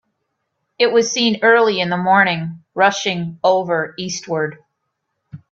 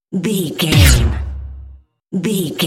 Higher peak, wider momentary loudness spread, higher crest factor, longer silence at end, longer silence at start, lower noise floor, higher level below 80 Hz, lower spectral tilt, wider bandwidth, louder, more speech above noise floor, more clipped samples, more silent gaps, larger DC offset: about the same, 0 dBFS vs 0 dBFS; second, 11 LU vs 18 LU; about the same, 18 dB vs 16 dB; first, 0.15 s vs 0 s; first, 0.8 s vs 0.1 s; first, -74 dBFS vs -40 dBFS; second, -64 dBFS vs -22 dBFS; about the same, -4 dB/octave vs -4.5 dB/octave; second, 7.8 kHz vs 17.5 kHz; about the same, -17 LUFS vs -15 LUFS; first, 57 dB vs 26 dB; neither; neither; neither